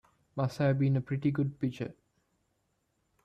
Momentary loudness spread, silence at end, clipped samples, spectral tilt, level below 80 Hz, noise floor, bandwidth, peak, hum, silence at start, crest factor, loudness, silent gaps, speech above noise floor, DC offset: 13 LU; 1.3 s; under 0.1%; -8.5 dB/octave; -66 dBFS; -77 dBFS; 8.4 kHz; -18 dBFS; none; 0.35 s; 14 dB; -31 LUFS; none; 47 dB; under 0.1%